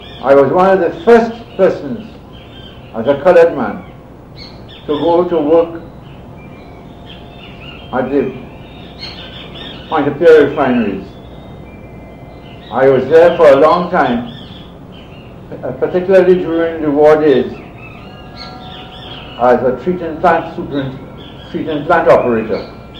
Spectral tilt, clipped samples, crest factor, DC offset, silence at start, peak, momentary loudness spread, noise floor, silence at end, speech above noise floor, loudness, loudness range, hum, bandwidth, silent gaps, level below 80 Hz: -7.5 dB/octave; under 0.1%; 14 dB; under 0.1%; 0 s; 0 dBFS; 25 LU; -34 dBFS; 0 s; 23 dB; -12 LUFS; 6 LU; none; 8 kHz; none; -40 dBFS